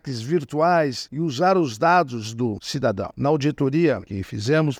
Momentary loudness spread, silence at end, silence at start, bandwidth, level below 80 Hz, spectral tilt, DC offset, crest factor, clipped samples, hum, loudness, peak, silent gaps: 8 LU; 0 s; 0.05 s; 15 kHz; -56 dBFS; -6 dB/octave; under 0.1%; 16 dB; under 0.1%; none; -22 LUFS; -6 dBFS; none